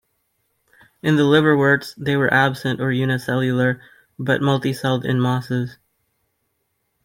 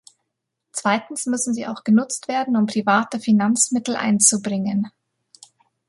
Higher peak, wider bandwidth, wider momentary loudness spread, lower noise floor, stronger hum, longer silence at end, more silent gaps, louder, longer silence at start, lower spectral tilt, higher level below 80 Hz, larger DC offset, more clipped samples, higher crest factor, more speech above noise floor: about the same, -2 dBFS vs -2 dBFS; first, 16.5 kHz vs 11.5 kHz; about the same, 10 LU vs 10 LU; second, -72 dBFS vs -79 dBFS; neither; first, 1.3 s vs 1 s; neither; about the same, -19 LUFS vs -20 LUFS; first, 1.05 s vs 0.75 s; first, -6.5 dB/octave vs -3.5 dB/octave; first, -60 dBFS vs -68 dBFS; neither; neither; about the same, 18 dB vs 20 dB; second, 53 dB vs 59 dB